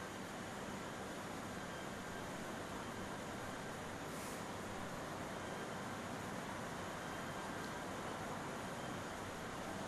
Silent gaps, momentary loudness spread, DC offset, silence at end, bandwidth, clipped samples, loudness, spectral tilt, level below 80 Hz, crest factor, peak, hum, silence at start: none; 1 LU; under 0.1%; 0 s; 13.5 kHz; under 0.1%; -46 LUFS; -4 dB/octave; -66 dBFS; 14 dB; -32 dBFS; none; 0 s